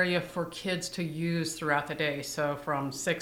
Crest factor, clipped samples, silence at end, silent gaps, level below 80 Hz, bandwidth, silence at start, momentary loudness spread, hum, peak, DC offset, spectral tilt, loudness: 20 dB; under 0.1%; 0 s; none; -62 dBFS; 17 kHz; 0 s; 4 LU; none; -12 dBFS; under 0.1%; -4.5 dB/octave; -31 LUFS